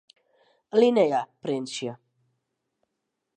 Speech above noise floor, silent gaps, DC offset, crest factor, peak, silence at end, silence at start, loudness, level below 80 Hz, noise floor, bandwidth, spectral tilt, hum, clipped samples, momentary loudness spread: 58 dB; none; under 0.1%; 20 dB; -8 dBFS; 1.4 s; 0.75 s; -25 LUFS; -82 dBFS; -81 dBFS; 9.6 kHz; -5 dB/octave; none; under 0.1%; 13 LU